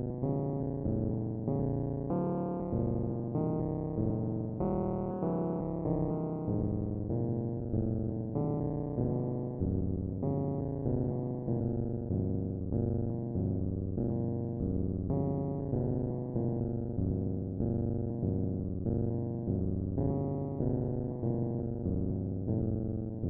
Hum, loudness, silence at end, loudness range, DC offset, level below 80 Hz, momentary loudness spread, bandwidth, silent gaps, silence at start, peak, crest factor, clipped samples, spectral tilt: none; -34 LUFS; 0 s; 0 LU; under 0.1%; -46 dBFS; 2 LU; 2.3 kHz; none; 0 s; -18 dBFS; 16 dB; under 0.1%; -15 dB/octave